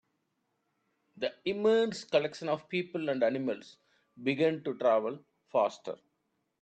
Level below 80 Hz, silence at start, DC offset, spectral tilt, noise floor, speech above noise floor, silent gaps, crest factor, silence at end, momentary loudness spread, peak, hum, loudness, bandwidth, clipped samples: -80 dBFS; 1.15 s; under 0.1%; -5.5 dB/octave; -80 dBFS; 49 dB; none; 20 dB; 0.65 s; 12 LU; -14 dBFS; none; -31 LUFS; 8.8 kHz; under 0.1%